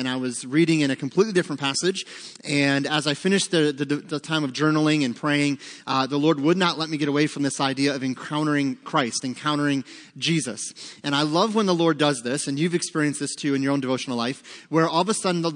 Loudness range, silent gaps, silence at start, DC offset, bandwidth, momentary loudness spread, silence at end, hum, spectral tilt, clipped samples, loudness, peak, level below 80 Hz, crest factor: 2 LU; none; 0 s; under 0.1%; 10.5 kHz; 7 LU; 0 s; none; -4.5 dB/octave; under 0.1%; -23 LUFS; -4 dBFS; -74 dBFS; 18 dB